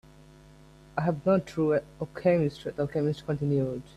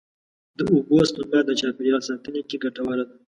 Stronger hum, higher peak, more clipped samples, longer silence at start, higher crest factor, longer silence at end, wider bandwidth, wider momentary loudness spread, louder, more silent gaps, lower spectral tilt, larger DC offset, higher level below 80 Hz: neither; second, -12 dBFS vs -6 dBFS; neither; first, 0.95 s vs 0.6 s; about the same, 16 dB vs 16 dB; about the same, 0.15 s vs 0.25 s; about the same, 12 kHz vs 11 kHz; second, 6 LU vs 10 LU; second, -28 LUFS vs -23 LUFS; neither; first, -8.5 dB/octave vs -5.5 dB/octave; neither; about the same, -58 dBFS vs -58 dBFS